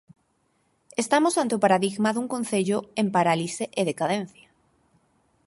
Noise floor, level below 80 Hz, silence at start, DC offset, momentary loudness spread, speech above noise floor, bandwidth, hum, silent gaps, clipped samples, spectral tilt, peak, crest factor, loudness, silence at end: -69 dBFS; -70 dBFS; 0.95 s; under 0.1%; 8 LU; 45 dB; 11.5 kHz; none; none; under 0.1%; -4.5 dB/octave; -6 dBFS; 20 dB; -24 LUFS; 1.2 s